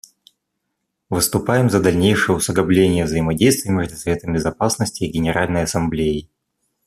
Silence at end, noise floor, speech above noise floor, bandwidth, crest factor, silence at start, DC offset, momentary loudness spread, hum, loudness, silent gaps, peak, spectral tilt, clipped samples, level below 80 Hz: 0.65 s; -76 dBFS; 58 dB; 14.5 kHz; 16 dB; 1.1 s; under 0.1%; 7 LU; none; -18 LUFS; none; -2 dBFS; -5 dB/octave; under 0.1%; -42 dBFS